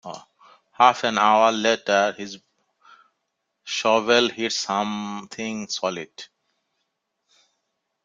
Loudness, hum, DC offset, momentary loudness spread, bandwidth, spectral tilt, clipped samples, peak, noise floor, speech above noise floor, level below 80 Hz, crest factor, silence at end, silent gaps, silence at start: -21 LUFS; none; under 0.1%; 21 LU; 9.4 kHz; -2.5 dB/octave; under 0.1%; -2 dBFS; -78 dBFS; 56 dB; -70 dBFS; 22 dB; 1.8 s; none; 0.05 s